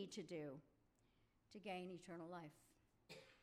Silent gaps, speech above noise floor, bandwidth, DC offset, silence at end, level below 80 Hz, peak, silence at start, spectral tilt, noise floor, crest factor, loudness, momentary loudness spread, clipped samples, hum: none; 26 dB; 15 kHz; under 0.1%; 0 s; -84 dBFS; -40 dBFS; 0 s; -5 dB/octave; -80 dBFS; 16 dB; -55 LUFS; 12 LU; under 0.1%; none